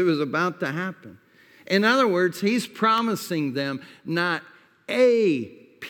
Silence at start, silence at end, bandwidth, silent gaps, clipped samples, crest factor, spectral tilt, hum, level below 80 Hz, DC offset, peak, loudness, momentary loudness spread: 0 s; 0 s; 19.5 kHz; none; under 0.1%; 18 dB; -5 dB/octave; none; -78 dBFS; under 0.1%; -6 dBFS; -23 LUFS; 12 LU